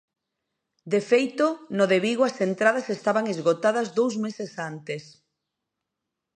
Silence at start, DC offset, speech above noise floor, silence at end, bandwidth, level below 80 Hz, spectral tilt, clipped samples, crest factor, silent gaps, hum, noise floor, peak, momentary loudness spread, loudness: 0.85 s; under 0.1%; 60 dB; 1.35 s; 10 kHz; -78 dBFS; -5 dB/octave; under 0.1%; 20 dB; none; none; -84 dBFS; -6 dBFS; 12 LU; -24 LUFS